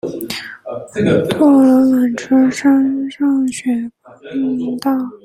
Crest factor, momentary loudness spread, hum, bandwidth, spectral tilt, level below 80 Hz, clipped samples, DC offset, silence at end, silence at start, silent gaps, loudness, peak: 14 dB; 15 LU; none; 16.5 kHz; -6 dB/octave; -54 dBFS; under 0.1%; under 0.1%; 0.1 s; 0.05 s; none; -15 LUFS; 0 dBFS